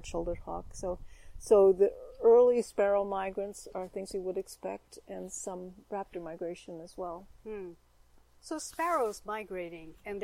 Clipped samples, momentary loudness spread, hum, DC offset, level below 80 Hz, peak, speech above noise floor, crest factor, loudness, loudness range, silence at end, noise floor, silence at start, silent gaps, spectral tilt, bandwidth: under 0.1%; 21 LU; none; under 0.1%; -54 dBFS; -12 dBFS; 30 dB; 18 dB; -31 LUFS; 14 LU; 0 s; -61 dBFS; 0 s; none; -5 dB/octave; 15.5 kHz